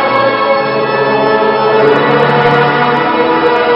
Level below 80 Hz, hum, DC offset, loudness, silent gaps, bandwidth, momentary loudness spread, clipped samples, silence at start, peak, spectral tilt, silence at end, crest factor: -48 dBFS; none; under 0.1%; -10 LUFS; none; 6 kHz; 3 LU; 0.2%; 0 s; 0 dBFS; -7.5 dB/octave; 0 s; 10 dB